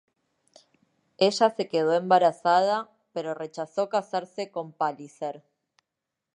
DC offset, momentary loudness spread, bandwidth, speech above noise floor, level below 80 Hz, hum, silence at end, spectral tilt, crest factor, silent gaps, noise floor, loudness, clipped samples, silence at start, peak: under 0.1%; 14 LU; 10.5 kHz; 60 dB; -80 dBFS; none; 1 s; -4.5 dB/octave; 20 dB; none; -85 dBFS; -26 LUFS; under 0.1%; 1.2 s; -6 dBFS